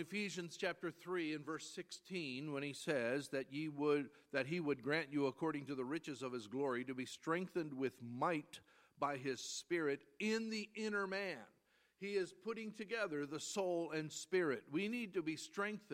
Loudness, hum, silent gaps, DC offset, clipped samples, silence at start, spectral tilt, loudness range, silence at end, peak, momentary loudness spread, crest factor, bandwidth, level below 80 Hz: -42 LUFS; none; none; under 0.1%; under 0.1%; 0 s; -4.5 dB/octave; 3 LU; 0 s; -22 dBFS; 7 LU; 20 dB; 16 kHz; -88 dBFS